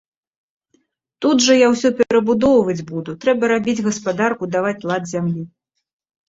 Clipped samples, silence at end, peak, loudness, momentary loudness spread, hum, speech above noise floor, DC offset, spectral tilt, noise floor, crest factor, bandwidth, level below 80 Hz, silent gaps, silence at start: under 0.1%; 0.8 s; -2 dBFS; -17 LUFS; 10 LU; none; 47 dB; under 0.1%; -4.5 dB/octave; -64 dBFS; 16 dB; 8 kHz; -54 dBFS; none; 1.2 s